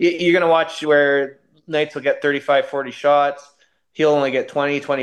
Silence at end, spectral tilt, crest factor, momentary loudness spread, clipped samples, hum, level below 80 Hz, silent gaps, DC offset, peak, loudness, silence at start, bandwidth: 0 s; -5 dB/octave; 14 dB; 9 LU; under 0.1%; none; -70 dBFS; none; under 0.1%; -4 dBFS; -18 LUFS; 0 s; 10.5 kHz